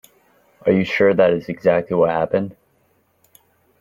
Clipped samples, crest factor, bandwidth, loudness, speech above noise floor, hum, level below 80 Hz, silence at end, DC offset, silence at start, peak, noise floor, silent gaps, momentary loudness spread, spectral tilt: under 0.1%; 16 dB; 14.5 kHz; -18 LUFS; 45 dB; none; -56 dBFS; 1.3 s; under 0.1%; 0.65 s; -4 dBFS; -62 dBFS; none; 9 LU; -7.5 dB/octave